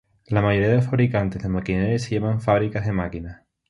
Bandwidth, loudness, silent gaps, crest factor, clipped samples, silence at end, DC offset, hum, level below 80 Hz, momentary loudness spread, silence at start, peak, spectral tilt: 11 kHz; -22 LUFS; none; 18 dB; under 0.1%; 0.35 s; under 0.1%; none; -42 dBFS; 8 LU; 0.3 s; -4 dBFS; -8 dB/octave